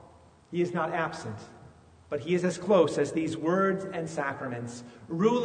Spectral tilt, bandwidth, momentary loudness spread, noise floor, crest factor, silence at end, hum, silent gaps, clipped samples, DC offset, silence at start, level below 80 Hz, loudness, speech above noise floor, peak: -6 dB/octave; 9.6 kHz; 16 LU; -55 dBFS; 20 dB; 0 s; none; none; under 0.1%; under 0.1%; 0 s; -66 dBFS; -29 LUFS; 27 dB; -10 dBFS